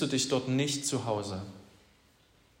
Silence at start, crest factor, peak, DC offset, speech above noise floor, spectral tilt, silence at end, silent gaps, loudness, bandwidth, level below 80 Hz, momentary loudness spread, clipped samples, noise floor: 0 s; 18 dB; -16 dBFS; under 0.1%; 33 dB; -4 dB/octave; 0.95 s; none; -31 LUFS; 16 kHz; -70 dBFS; 12 LU; under 0.1%; -64 dBFS